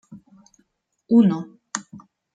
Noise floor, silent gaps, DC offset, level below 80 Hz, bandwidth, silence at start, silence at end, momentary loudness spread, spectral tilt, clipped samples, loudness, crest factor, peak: -67 dBFS; none; under 0.1%; -70 dBFS; 9.4 kHz; 0.1 s; 0.4 s; 15 LU; -6.5 dB/octave; under 0.1%; -21 LUFS; 18 dB; -6 dBFS